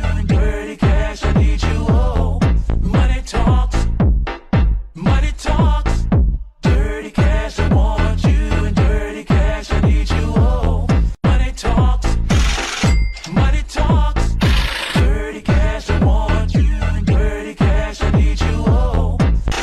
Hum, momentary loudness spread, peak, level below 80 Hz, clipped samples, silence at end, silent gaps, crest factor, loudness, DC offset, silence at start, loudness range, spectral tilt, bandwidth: none; 3 LU; -6 dBFS; -16 dBFS; under 0.1%; 0 s; none; 8 dB; -17 LUFS; under 0.1%; 0 s; 1 LU; -6.5 dB/octave; 11 kHz